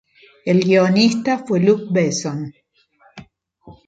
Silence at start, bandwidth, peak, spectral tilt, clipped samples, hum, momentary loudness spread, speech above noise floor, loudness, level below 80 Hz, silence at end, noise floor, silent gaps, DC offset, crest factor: 0.45 s; 9 kHz; -2 dBFS; -5.5 dB/octave; under 0.1%; none; 14 LU; 40 dB; -17 LUFS; -60 dBFS; 0.15 s; -56 dBFS; none; under 0.1%; 16 dB